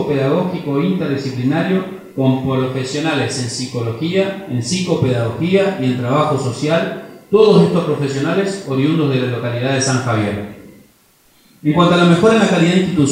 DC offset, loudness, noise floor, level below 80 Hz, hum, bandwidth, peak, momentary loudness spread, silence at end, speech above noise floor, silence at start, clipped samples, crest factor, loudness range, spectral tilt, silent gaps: under 0.1%; -16 LUFS; -53 dBFS; -52 dBFS; none; 15 kHz; 0 dBFS; 10 LU; 0 s; 37 dB; 0 s; under 0.1%; 16 dB; 3 LU; -6 dB/octave; none